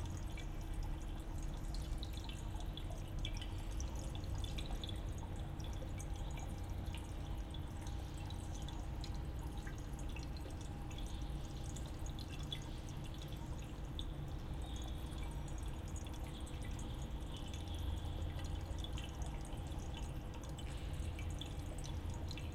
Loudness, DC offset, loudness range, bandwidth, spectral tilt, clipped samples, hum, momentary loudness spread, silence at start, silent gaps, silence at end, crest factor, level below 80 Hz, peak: -47 LUFS; under 0.1%; 1 LU; 16 kHz; -5.5 dB/octave; under 0.1%; none; 3 LU; 0 s; none; 0 s; 16 dB; -46 dBFS; -28 dBFS